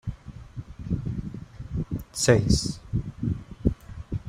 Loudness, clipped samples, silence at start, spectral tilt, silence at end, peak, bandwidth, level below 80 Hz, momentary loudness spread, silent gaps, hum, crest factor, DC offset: -27 LUFS; under 0.1%; 0.05 s; -5.5 dB/octave; 0 s; -4 dBFS; 15.5 kHz; -38 dBFS; 20 LU; none; none; 24 dB; under 0.1%